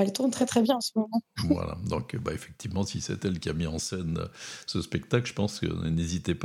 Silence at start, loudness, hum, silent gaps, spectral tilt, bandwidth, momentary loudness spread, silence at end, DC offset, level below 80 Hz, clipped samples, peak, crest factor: 0 s; -30 LUFS; none; none; -5.5 dB/octave; 16 kHz; 9 LU; 0 s; under 0.1%; -52 dBFS; under 0.1%; -8 dBFS; 20 dB